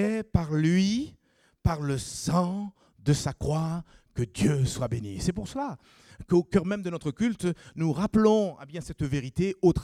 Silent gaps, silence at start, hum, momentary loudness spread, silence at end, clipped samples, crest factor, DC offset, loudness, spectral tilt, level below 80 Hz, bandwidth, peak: none; 0 s; none; 11 LU; 0 s; under 0.1%; 20 dB; under 0.1%; -28 LUFS; -6.5 dB/octave; -46 dBFS; 14.5 kHz; -8 dBFS